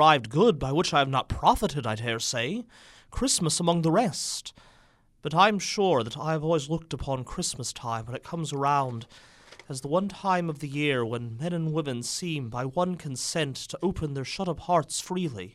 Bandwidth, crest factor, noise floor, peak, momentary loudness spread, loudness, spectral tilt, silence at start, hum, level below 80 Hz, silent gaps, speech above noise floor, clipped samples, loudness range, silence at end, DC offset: 14.5 kHz; 22 dB; -60 dBFS; -6 dBFS; 10 LU; -27 LUFS; -4.5 dB/octave; 0 s; none; -50 dBFS; none; 33 dB; under 0.1%; 4 LU; 0.05 s; under 0.1%